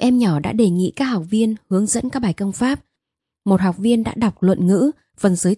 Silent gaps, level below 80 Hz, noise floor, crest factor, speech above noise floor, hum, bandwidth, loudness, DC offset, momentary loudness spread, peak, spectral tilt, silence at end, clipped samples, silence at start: none; -50 dBFS; -82 dBFS; 16 dB; 65 dB; none; 12 kHz; -19 LUFS; under 0.1%; 5 LU; -2 dBFS; -6 dB/octave; 0 s; under 0.1%; 0 s